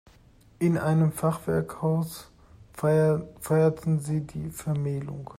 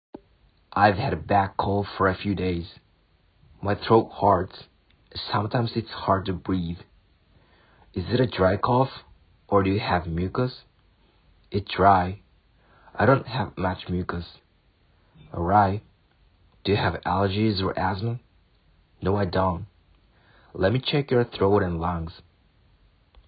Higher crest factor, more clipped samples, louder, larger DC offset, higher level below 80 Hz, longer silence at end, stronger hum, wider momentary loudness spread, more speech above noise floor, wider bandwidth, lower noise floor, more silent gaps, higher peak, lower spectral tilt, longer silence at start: second, 14 dB vs 22 dB; neither; about the same, -27 LUFS vs -25 LUFS; neither; second, -56 dBFS vs -44 dBFS; second, 0 s vs 1.1 s; neither; second, 10 LU vs 14 LU; second, 30 dB vs 39 dB; first, 16 kHz vs 5.2 kHz; second, -56 dBFS vs -63 dBFS; neither; second, -12 dBFS vs -4 dBFS; second, -8 dB/octave vs -11 dB/octave; second, 0.6 s vs 0.75 s